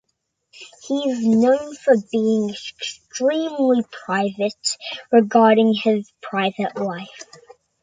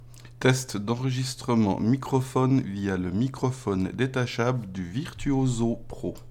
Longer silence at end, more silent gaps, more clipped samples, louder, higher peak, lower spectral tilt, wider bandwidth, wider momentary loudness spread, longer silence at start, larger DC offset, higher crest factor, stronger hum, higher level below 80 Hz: first, 0.6 s vs 0 s; neither; neither; first, -20 LUFS vs -27 LUFS; first, -4 dBFS vs -8 dBFS; about the same, -5 dB/octave vs -6 dB/octave; second, 9.4 kHz vs 15 kHz; first, 14 LU vs 8 LU; first, 0.6 s vs 0 s; neither; about the same, 16 dB vs 18 dB; neither; second, -68 dBFS vs -48 dBFS